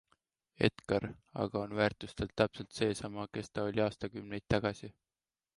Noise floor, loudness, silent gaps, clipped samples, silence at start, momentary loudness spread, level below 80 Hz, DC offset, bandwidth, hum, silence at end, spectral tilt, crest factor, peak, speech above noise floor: under -90 dBFS; -36 LUFS; none; under 0.1%; 0.6 s; 9 LU; -58 dBFS; under 0.1%; 11.5 kHz; none; 0.65 s; -6 dB/octave; 22 dB; -14 dBFS; over 55 dB